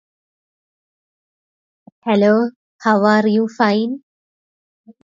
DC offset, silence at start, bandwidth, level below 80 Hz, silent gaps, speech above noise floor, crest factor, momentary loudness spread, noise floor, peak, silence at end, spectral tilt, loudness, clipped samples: under 0.1%; 2.05 s; 7.4 kHz; -68 dBFS; 2.56-2.79 s; over 75 dB; 18 dB; 11 LU; under -90 dBFS; -2 dBFS; 1.05 s; -7 dB/octave; -16 LUFS; under 0.1%